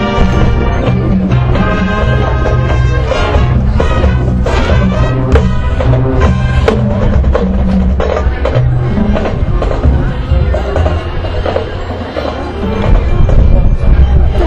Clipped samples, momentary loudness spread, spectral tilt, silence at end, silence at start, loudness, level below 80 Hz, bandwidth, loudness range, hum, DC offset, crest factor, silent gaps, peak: 0.9%; 5 LU; -8 dB/octave; 0 s; 0 s; -12 LUFS; -12 dBFS; 7.8 kHz; 3 LU; none; under 0.1%; 10 dB; none; 0 dBFS